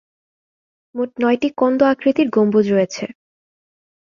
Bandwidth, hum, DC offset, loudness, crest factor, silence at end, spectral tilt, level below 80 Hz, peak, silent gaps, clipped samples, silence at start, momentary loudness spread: 7.4 kHz; none; under 0.1%; -17 LUFS; 16 dB; 1.05 s; -6.5 dB/octave; -62 dBFS; -2 dBFS; none; under 0.1%; 0.95 s; 12 LU